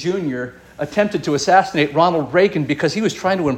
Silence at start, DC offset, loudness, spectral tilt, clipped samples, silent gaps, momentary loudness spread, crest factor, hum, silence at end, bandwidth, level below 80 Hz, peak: 0 s; under 0.1%; -18 LUFS; -5 dB/octave; under 0.1%; none; 10 LU; 16 dB; none; 0 s; 16 kHz; -52 dBFS; -2 dBFS